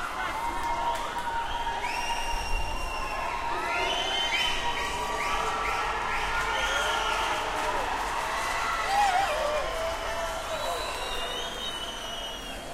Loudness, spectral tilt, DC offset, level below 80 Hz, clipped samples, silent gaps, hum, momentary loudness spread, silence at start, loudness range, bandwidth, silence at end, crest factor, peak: -29 LUFS; -2 dB/octave; under 0.1%; -40 dBFS; under 0.1%; none; none; 6 LU; 0 s; 4 LU; 16 kHz; 0 s; 16 dB; -14 dBFS